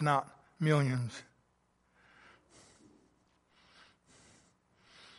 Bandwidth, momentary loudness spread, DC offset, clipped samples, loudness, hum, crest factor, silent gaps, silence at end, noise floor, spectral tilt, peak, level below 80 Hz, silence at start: 11.5 kHz; 22 LU; under 0.1%; under 0.1%; -33 LUFS; none; 24 dB; none; 3.95 s; -74 dBFS; -6.5 dB/octave; -14 dBFS; -76 dBFS; 0 s